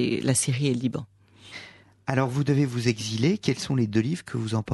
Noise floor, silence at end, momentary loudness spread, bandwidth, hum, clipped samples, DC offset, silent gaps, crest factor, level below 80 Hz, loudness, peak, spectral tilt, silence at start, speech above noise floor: -49 dBFS; 0 s; 14 LU; 12 kHz; none; under 0.1%; under 0.1%; none; 18 dB; -60 dBFS; -25 LUFS; -6 dBFS; -5.5 dB/octave; 0 s; 24 dB